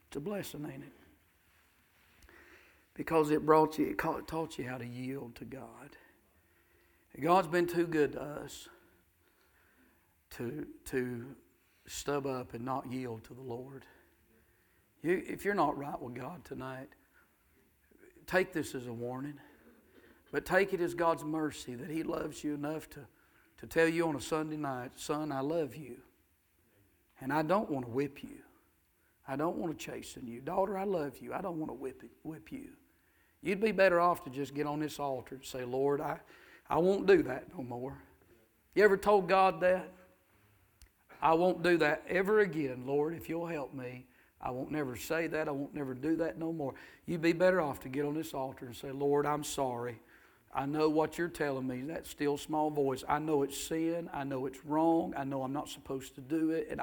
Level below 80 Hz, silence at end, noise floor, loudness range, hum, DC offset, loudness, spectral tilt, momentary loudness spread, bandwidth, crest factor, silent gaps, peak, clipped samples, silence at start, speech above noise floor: -64 dBFS; 0 s; -72 dBFS; 8 LU; none; under 0.1%; -34 LUFS; -5.5 dB/octave; 17 LU; 19 kHz; 24 dB; none; -10 dBFS; under 0.1%; 0.1 s; 38 dB